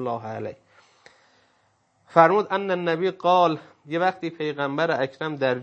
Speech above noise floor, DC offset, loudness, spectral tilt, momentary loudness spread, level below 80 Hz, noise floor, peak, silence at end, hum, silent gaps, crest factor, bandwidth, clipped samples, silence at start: 43 dB; under 0.1%; -23 LUFS; -6.5 dB/octave; 13 LU; -74 dBFS; -66 dBFS; -2 dBFS; 0 s; none; none; 24 dB; 8 kHz; under 0.1%; 0 s